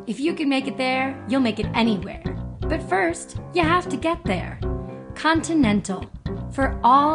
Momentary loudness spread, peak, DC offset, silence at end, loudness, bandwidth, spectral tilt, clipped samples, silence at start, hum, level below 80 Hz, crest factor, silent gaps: 11 LU; -6 dBFS; under 0.1%; 0 s; -23 LUFS; 11 kHz; -5.5 dB/octave; under 0.1%; 0 s; none; -38 dBFS; 18 dB; none